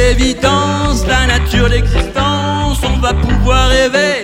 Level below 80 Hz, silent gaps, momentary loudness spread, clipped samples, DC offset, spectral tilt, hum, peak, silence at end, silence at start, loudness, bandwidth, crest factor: -16 dBFS; none; 4 LU; under 0.1%; under 0.1%; -4.5 dB/octave; none; 0 dBFS; 0 s; 0 s; -12 LUFS; 16 kHz; 12 dB